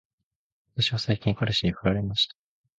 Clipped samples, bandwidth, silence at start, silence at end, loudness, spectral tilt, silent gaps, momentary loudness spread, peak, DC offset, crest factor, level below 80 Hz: under 0.1%; 8.8 kHz; 0.75 s; 0.5 s; -26 LUFS; -5.5 dB/octave; none; 2 LU; -10 dBFS; under 0.1%; 18 dB; -48 dBFS